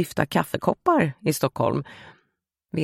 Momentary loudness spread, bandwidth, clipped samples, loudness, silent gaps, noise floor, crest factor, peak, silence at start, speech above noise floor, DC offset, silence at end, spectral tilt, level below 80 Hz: 9 LU; 16.5 kHz; under 0.1%; -24 LUFS; none; -76 dBFS; 22 dB; -2 dBFS; 0 s; 52 dB; under 0.1%; 0 s; -6 dB/octave; -56 dBFS